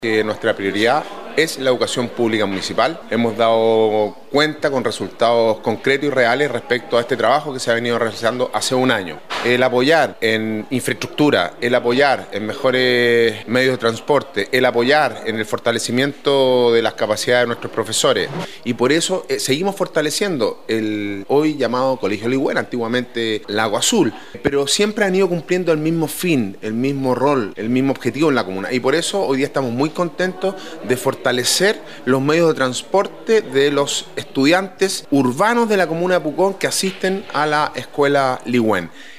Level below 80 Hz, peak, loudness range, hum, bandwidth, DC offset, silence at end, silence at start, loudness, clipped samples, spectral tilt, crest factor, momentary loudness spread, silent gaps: -58 dBFS; 0 dBFS; 2 LU; none; 15.5 kHz; 0.9%; 0 s; 0 s; -18 LUFS; under 0.1%; -4 dB/octave; 16 dB; 6 LU; none